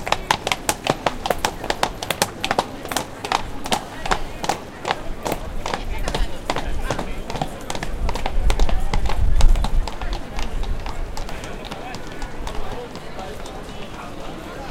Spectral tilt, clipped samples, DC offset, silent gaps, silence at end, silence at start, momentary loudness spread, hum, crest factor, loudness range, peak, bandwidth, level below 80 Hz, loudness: -3.5 dB/octave; under 0.1%; under 0.1%; none; 0 s; 0 s; 12 LU; none; 22 dB; 8 LU; 0 dBFS; 17 kHz; -24 dBFS; -26 LUFS